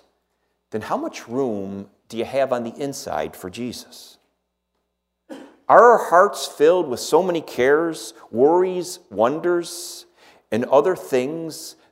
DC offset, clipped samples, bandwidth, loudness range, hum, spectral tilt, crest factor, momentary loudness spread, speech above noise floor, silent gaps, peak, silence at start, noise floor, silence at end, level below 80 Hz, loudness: under 0.1%; under 0.1%; 16 kHz; 11 LU; none; -4.5 dB/octave; 20 dB; 17 LU; 56 dB; none; 0 dBFS; 0.75 s; -76 dBFS; 0.2 s; -64 dBFS; -20 LUFS